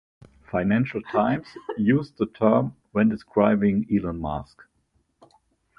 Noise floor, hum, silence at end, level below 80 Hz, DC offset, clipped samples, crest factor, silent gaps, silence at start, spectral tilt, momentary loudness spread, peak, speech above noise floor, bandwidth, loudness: -69 dBFS; none; 1.35 s; -50 dBFS; under 0.1%; under 0.1%; 20 dB; none; 0.55 s; -9.5 dB/octave; 9 LU; -4 dBFS; 46 dB; 5.4 kHz; -24 LUFS